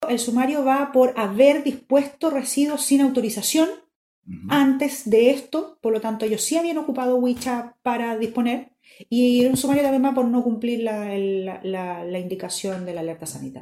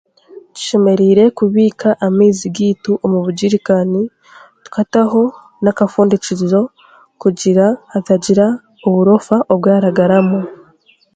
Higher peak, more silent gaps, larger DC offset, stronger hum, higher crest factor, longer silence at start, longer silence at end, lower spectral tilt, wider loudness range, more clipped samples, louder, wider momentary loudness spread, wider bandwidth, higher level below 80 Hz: second, -4 dBFS vs 0 dBFS; first, 3.96-4.22 s vs none; neither; neither; about the same, 18 dB vs 14 dB; second, 0 s vs 0.35 s; second, 0 s vs 0.6 s; second, -4 dB/octave vs -6.5 dB/octave; about the same, 4 LU vs 3 LU; neither; second, -22 LUFS vs -13 LUFS; first, 11 LU vs 8 LU; first, 15.5 kHz vs 9.2 kHz; second, -62 dBFS vs -56 dBFS